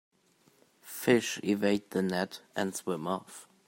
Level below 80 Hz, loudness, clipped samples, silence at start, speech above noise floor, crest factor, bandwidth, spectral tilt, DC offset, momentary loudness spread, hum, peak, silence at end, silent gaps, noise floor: -76 dBFS; -31 LUFS; under 0.1%; 0.85 s; 36 dB; 22 dB; 16.5 kHz; -4.5 dB/octave; under 0.1%; 10 LU; none; -12 dBFS; 0.25 s; none; -67 dBFS